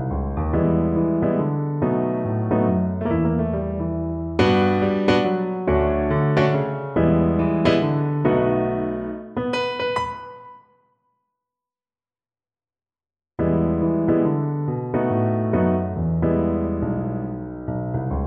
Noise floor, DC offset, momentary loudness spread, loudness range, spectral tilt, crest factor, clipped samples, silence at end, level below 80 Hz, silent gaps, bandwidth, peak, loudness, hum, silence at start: under -90 dBFS; under 0.1%; 8 LU; 9 LU; -8.5 dB/octave; 18 dB; under 0.1%; 0 s; -36 dBFS; none; 8.8 kHz; -4 dBFS; -22 LUFS; none; 0 s